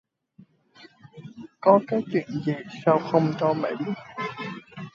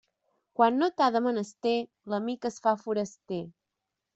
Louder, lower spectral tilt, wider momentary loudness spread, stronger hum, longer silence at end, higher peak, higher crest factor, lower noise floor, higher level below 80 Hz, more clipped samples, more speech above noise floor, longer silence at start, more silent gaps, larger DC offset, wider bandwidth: first, -25 LUFS vs -29 LUFS; first, -8 dB/octave vs -5.5 dB/octave; first, 21 LU vs 12 LU; neither; second, 0.05 s vs 0.65 s; first, -4 dBFS vs -8 dBFS; about the same, 22 dB vs 22 dB; second, -56 dBFS vs -86 dBFS; about the same, -70 dBFS vs -74 dBFS; neither; second, 33 dB vs 58 dB; first, 0.8 s vs 0.6 s; neither; neither; second, 7.4 kHz vs 8.2 kHz